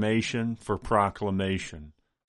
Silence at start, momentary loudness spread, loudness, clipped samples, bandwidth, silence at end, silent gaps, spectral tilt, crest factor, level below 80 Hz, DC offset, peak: 0 s; 10 LU; -28 LUFS; under 0.1%; 11.5 kHz; 0.4 s; none; -6 dB/octave; 20 dB; -50 dBFS; under 0.1%; -10 dBFS